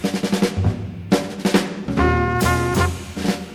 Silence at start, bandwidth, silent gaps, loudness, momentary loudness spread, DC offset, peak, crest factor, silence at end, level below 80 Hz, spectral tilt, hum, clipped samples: 0 s; 20 kHz; none; -20 LUFS; 6 LU; under 0.1%; -2 dBFS; 16 dB; 0 s; -36 dBFS; -5.5 dB/octave; none; under 0.1%